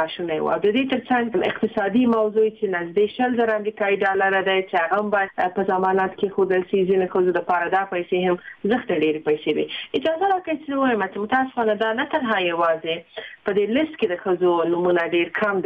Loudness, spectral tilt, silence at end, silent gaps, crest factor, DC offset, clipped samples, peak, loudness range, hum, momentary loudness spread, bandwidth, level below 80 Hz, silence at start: -21 LUFS; -7.5 dB/octave; 0 s; none; 12 dB; under 0.1%; under 0.1%; -8 dBFS; 2 LU; none; 5 LU; 5 kHz; -62 dBFS; 0 s